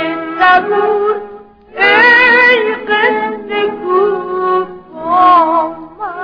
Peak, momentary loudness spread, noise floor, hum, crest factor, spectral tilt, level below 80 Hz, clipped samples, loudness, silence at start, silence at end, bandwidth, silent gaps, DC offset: 0 dBFS; 16 LU; -34 dBFS; none; 12 dB; -5 dB/octave; -52 dBFS; under 0.1%; -10 LUFS; 0 s; 0 s; 5.4 kHz; none; under 0.1%